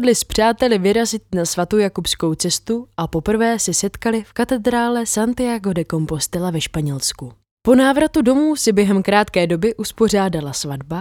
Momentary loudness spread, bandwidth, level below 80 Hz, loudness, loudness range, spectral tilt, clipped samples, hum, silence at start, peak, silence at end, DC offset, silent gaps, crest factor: 7 LU; 18 kHz; -42 dBFS; -18 LUFS; 4 LU; -4.5 dB/octave; under 0.1%; none; 0 s; 0 dBFS; 0 s; under 0.1%; 7.51-7.57 s; 18 dB